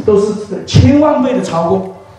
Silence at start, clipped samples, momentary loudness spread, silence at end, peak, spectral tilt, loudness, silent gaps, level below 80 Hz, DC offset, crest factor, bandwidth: 0 s; 0.4%; 9 LU; 0.05 s; 0 dBFS; -7 dB/octave; -12 LUFS; none; -34 dBFS; under 0.1%; 12 dB; 10.5 kHz